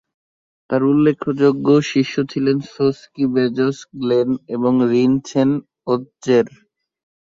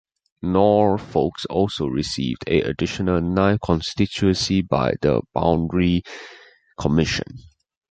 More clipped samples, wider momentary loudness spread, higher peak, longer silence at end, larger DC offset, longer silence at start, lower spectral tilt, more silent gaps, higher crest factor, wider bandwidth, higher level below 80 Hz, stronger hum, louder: neither; about the same, 7 LU vs 7 LU; about the same, -2 dBFS vs -2 dBFS; first, 0.8 s vs 0.5 s; neither; first, 0.7 s vs 0.45 s; about the same, -7 dB/octave vs -6 dB/octave; neither; about the same, 16 dB vs 18 dB; second, 7.6 kHz vs 9.2 kHz; second, -60 dBFS vs -40 dBFS; neither; first, -18 LUFS vs -21 LUFS